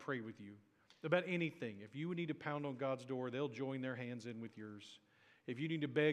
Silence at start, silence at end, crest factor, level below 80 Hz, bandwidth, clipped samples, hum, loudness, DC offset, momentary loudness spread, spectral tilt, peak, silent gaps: 0 s; 0 s; 24 dB; under -90 dBFS; 10.5 kHz; under 0.1%; none; -43 LUFS; under 0.1%; 16 LU; -7 dB/octave; -20 dBFS; none